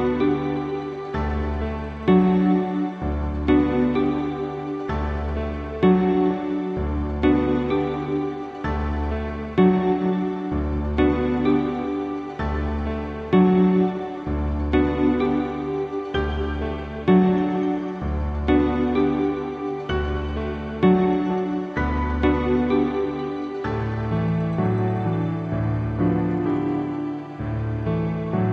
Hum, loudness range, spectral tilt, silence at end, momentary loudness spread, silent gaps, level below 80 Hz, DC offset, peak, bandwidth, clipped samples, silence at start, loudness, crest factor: none; 2 LU; -9.5 dB/octave; 0 s; 10 LU; none; -32 dBFS; under 0.1%; -6 dBFS; 6.4 kHz; under 0.1%; 0 s; -23 LUFS; 16 dB